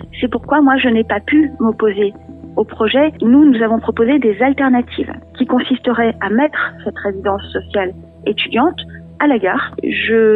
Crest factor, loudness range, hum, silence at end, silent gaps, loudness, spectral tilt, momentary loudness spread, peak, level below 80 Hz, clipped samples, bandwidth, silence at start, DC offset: 14 dB; 4 LU; none; 0 s; none; -15 LUFS; -8.5 dB/octave; 11 LU; 0 dBFS; -44 dBFS; under 0.1%; 4.1 kHz; 0 s; under 0.1%